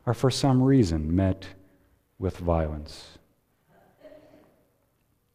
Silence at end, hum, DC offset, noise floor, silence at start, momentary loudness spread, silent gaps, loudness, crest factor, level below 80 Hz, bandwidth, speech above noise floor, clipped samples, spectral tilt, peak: 1.25 s; none; under 0.1%; -70 dBFS; 0.05 s; 20 LU; none; -25 LUFS; 18 dB; -42 dBFS; 14.5 kHz; 45 dB; under 0.1%; -7 dB/octave; -10 dBFS